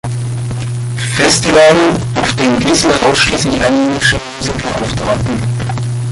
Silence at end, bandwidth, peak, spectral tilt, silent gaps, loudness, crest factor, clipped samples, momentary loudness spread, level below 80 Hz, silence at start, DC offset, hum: 0 s; 11.5 kHz; 0 dBFS; -4.5 dB/octave; none; -12 LUFS; 12 dB; under 0.1%; 11 LU; -32 dBFS; 0.05 s; under 0.1%; none